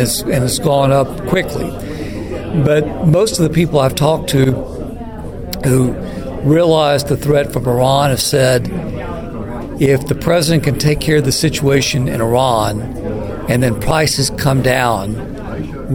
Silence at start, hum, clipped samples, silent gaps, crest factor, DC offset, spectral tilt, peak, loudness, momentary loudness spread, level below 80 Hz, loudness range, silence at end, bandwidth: 0 s; none; under 0.1%; none; 14 dB; under 0.1%; -5.5 dB/octave; 0 dBFS; -15 LUFS; 12 LU; -30 dBFS; 2 LU; 0 s; 17.5 kHz